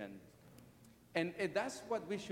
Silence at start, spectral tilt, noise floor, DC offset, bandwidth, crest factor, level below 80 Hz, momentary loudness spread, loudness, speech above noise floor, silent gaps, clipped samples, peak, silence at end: 0 s; -4.5 dB/octave; -63 dBFS; under 0.1%; 16.5 kHz; 20 dB; -76 dBFS; 23 LU; -40 LUFS; 24 dB; none; under 0.1%; -22 dBFS; 0 s